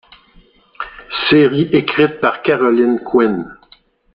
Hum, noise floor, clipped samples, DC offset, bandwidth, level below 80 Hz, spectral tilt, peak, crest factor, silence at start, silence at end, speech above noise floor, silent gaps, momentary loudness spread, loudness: none; -51 dBFS; under 0.1%; under 0.1%; 5.4 kHz; -50 dBFS; -8.5 dB/octave; -2 dBFS; 14 dB; 0.8 s; 0.6 s; 37 dB; none; 18 LU; -14 LUFS